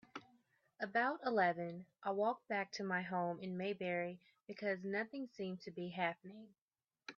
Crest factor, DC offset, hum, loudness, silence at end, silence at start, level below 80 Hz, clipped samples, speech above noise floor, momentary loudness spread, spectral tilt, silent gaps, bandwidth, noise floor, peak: 20 dB; under 0.1%; none; -41 LUFS; 0.05 s; 0.15 s; -88 dBFS; under 0.1%; 34 dB; 18 LU; -4 dB/octave; 6.61-6.68 s; 7 kHz; -75 dBFS; -22 dBFS